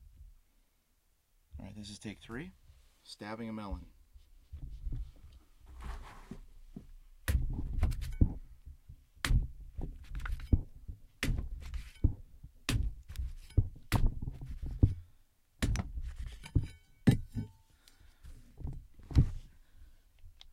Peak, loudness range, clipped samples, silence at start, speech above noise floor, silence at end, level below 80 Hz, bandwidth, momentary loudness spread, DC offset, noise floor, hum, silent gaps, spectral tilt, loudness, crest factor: -10 dBFS; 11 LU; under 0.1%; 0 s; 29 dB; 0.2 s; -40 dBFS; 16 kHz; 22 LU; under 0.1%; -73 dBFS; none; none; -6 dB/octave; -37 LUFS; 26 dB